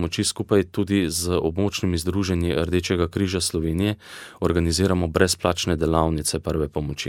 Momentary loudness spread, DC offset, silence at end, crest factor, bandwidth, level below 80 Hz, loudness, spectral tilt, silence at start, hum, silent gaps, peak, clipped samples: 5 LU; under 0.1%; 0 s; 20 dB; 17 kHz; -38 dBFS; -23 LUFS; -5 dB/octave; 0 s; none; none; -2 dBFS; under 0.1%